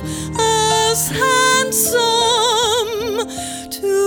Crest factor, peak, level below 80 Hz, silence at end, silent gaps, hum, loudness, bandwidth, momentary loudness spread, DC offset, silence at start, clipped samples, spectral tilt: 14 dB; -2 dBFS; -42 dBFS; 0 s; none; none; -15 LUFS; over 20 kHz; 10 LU; under 0.1%; 0 s; under 0.1%; -2 dB/octave